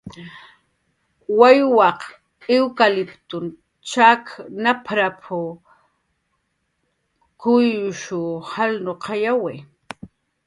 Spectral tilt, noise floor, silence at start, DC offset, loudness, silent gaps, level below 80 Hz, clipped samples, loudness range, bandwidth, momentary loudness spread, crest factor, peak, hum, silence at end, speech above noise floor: -5 dB/octave; -71 dBFS; 0.05 s; under 0.1%; -19 LUFS; none; -64 dBFS; under 0.1%; 7 LU; 11 kHz; 24 LU; 20 dB; 0 dBFS; none; 0.4 s; 53 dB